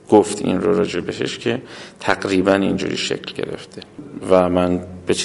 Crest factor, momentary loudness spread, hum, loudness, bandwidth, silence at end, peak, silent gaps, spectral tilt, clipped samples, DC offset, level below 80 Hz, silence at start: 20 dB; 17 LU; none; -19 LUFS; 11.5 kHz; 0 s; 0 dBFS; none; -5 dB/octave; under 0.1%; under 0.1%; -46 dBFS; 0.1 s